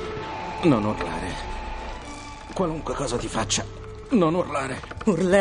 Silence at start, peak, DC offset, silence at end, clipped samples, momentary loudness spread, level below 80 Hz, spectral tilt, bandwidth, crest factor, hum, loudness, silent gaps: 0 s; -6 dBFS; under 0.1%; 0 s; under 0.1%; 15 LU; -40 dBFS; -5 dB/octave; 10.5 kHz; 18 dB; none; -26 LUFS; none